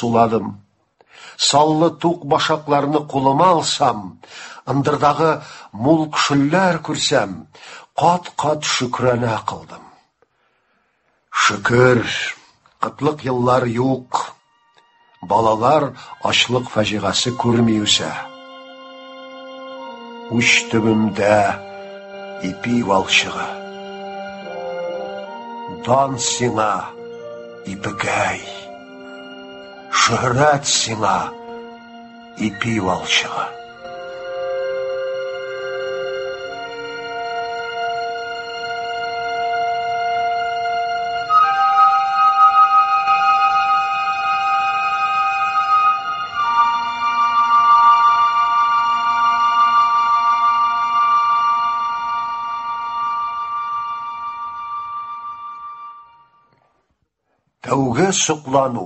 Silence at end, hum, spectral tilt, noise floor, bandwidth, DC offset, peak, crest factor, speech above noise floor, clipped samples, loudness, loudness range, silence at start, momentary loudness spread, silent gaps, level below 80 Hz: 0 s; none; -4 dB/octave; -69 dBFS; 8.6 kHz; under 0.1%; 0 dBFS; 18 dB; 51 dB; under 0.1%; -17 LUFS; 11 LU; 0 s; 20 LU; none; -54 dBFS